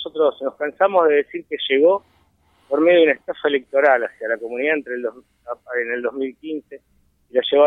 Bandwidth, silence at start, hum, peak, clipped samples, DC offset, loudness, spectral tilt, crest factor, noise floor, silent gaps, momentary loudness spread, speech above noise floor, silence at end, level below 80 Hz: 3.9 kHz; 0 s; none; -4 dBFS; under 0.1%; under 0.1%; -19 LUFS; -6 dB/octave; 16 dB; -59 dBFS; none; 13 LU; 40 dB; 0 s; -68 dBFS